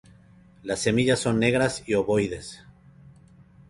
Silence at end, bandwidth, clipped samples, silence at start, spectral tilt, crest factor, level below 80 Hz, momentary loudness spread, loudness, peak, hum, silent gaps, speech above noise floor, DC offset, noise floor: 1.15 s; 11.5 kHz; under 0.1%; 0.65 s; -5 dB/octave; 20 dB; -52 dBFS; 15 LU; -24 LUFS; -6 dBFS; none; none; 30 dB; under 0.1%; -53 dBFS